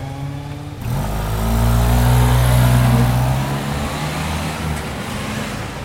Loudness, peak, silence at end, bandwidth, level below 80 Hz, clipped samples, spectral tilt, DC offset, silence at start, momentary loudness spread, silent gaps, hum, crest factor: -18 LUFS; -4 dBFS; 0 s; 16.5 kHz; -24 dBFS; under 0.1%; -6 dB/octave; under 0.1%; 0 s; 12 LU; none; none; 14 dB